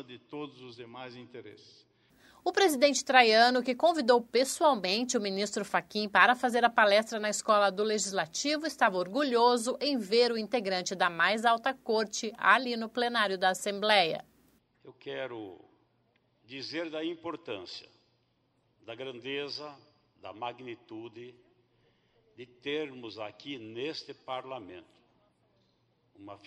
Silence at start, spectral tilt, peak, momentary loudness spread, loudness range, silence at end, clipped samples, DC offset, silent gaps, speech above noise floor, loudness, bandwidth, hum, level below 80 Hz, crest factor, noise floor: 0 s; -2.5 dB/octave; -6 dBFS; 21 LU; 16 LU; 0.1 s; under 0.1%; under 0.1%; none; 43 dB; -28 LUFS; 15.5 kHz; none; -78 dBFS; 26 dB; -73 dBFS